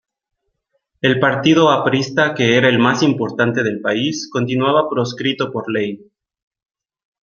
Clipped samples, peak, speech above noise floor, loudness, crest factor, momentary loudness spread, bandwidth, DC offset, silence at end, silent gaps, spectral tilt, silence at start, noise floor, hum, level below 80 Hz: under 0.1%; 0 dBFS; 54 dB; -16 LUFS; 16 dB; 9 LU; 7.2 kHz; under 0.1%; 1.25 s; none; -5.5 dB/octave; 1.05 s; -70 dBFS; none; -60 dBFS